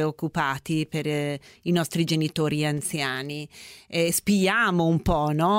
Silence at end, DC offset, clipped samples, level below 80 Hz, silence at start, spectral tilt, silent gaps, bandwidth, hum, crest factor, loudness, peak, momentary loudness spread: 0 s; under 0.1%; under 0.1%; -46 dBFS; 0 s; -5 dB/octave; none; 16 kHz; none; 16 dB; -25 LUFS; -10 dBFS; 10 LU